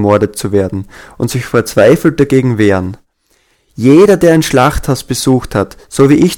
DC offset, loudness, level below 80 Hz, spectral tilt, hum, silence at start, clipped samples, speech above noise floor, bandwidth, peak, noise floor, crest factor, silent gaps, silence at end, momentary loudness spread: under 0.1%; -10 LUFS; -32 dBFS; -6 dB/octave; none; 0 s; 0.7%; 46 dB; 18 kHz; 0 dBFS; -56 dBFS; 10 dB; none; 0 s; 12 LU